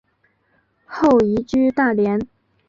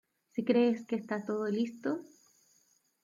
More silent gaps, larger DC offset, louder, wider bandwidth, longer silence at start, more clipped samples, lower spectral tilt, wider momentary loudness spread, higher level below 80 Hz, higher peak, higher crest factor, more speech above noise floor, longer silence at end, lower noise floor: neither; neither; first, -18 LUFS vs -33 LUFS; about the same, 7.4 kHz vs 7.4 kHz; first, 0.9 s vs 0.35 s; neither; about the same, -7.5 dB/octave vs -6.5 dB/octave; first, 14 LU vs 10 LU; first, -50 dBFS vs -82 dBFS; first, -6 dBFS vs -16 dBFS; about the same, 14 dB vs 18 dB; first, 47 dB vs 40 dB; second, 0.45 s vs 1 s; second, -64 dBFS vs -71 dBFS